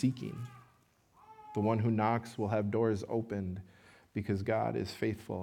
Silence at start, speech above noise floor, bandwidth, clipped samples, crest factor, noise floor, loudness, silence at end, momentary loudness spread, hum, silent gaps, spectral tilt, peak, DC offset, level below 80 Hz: 0 s; 35 dB; 15 kHz; under 0.1%; 18 dB; -68 dBFS; -34 LUFS; 0 s; 12 LU; none; none; -8 dB/octave; -16 dBFS; under 0.1%; -70 dBFS